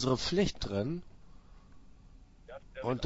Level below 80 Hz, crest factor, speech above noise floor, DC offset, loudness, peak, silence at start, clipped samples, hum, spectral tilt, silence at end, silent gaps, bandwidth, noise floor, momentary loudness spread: -50 dBFS; 20 dB; 24 dB; under 0.1%; -34 LUFS; -16 dBFS; 0 s; under 0.1%; none; -5 dB/octave; 0 s; none; 7.6 kHz; -56 dBFS; 21 LU